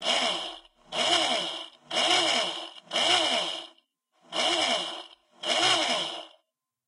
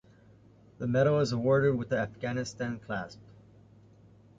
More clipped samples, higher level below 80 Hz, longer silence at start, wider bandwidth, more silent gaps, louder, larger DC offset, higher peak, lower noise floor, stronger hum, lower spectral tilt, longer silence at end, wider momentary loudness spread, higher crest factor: neither; second, -76 dBFS vs -60 dBFS; second, 0 s vs 0.8 s; first, 11.5 kHz vs 7.8 kHz; neither; first, -25 LUFS vs -30 LUFS; neither; about the same, -10 dBFS vs -12 dBFS; first, -78 dBFS vs -58 dBFS; neither; second, -0.5 dB/octave vs -7 dB/octave; second, 0.6 s vs 1.25 s; first, 15 LU vs 12 LU; about the same, 18 dB vs 18 dB